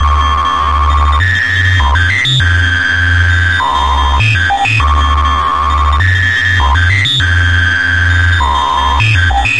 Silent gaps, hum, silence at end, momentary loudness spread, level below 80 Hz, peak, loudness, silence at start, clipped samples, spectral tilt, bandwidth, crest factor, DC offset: none; none; 0 s; 2 LU; -18 dBFS; 0 dBFS; -10 LUFS; 0 s; under 0.1%; -4 dB/octave; 11.5 kHz; 10 dB; 3%